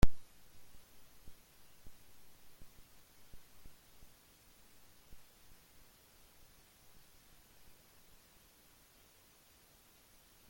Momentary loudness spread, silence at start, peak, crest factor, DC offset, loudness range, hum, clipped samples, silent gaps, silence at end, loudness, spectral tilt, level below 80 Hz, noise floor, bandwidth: 1 LU; 0.05 s; -12 dBFS; 28 dB; under 0.1%; 1 LU; none; under 0.1%; none; 10.3 s; -57 LUFS; -5.5 dB/octave; -48 dBFS; -65 dBFS; 17 kHz